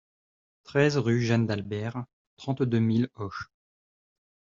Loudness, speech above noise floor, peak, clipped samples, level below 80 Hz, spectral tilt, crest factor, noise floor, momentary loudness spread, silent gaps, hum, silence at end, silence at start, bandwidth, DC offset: -27 LUFS; over 64 dB; -8 dBFS; under 0.1%; -62 dBFS; -6.5 dB/octave; 20 dB; under -90 dBFS; 16 LU; 2.13-2.37 s; none; 1.15 s; 0.7 s; 7.4 kHz; under 0.1%